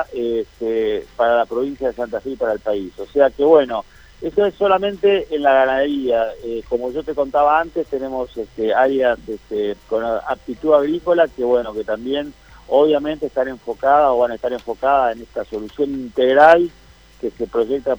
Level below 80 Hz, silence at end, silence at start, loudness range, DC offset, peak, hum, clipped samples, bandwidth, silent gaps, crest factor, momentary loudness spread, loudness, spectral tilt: -48 dBFS; 0 s; 0 s; 3 LU; under 0.1%; 0 dBFS; none; under 0.1%; over 20 kHz; none; 18 dB; 11 LU; -18 LUFS; -6 dB/octave